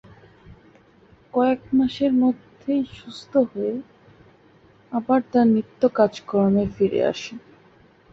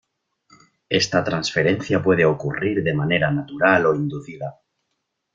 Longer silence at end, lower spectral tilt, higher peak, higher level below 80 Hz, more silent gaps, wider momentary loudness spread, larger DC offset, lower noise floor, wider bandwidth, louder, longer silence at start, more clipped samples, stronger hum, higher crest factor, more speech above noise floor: about the same, 0.75 s vs 0.85 s; first, -7.5 dB/octave vs -5.5 dB/octave; about the same, -4 dBFS vs -2 dBFS; about the same, -54 dBFS vs -54 dBFS; neither; about the same, 13 LU vs 12 LU; neither; second, -54 dBFS vs -76 dBFS; about the same, 7.6 kHz vs 7.6 kHz; about the same, -22 LUFS vs -20 LUFS; second, 0.5 s vs 0.9 s; neither; neither; about the same, 18 dB vs 20 dB; second, 33 dB vs 56 dB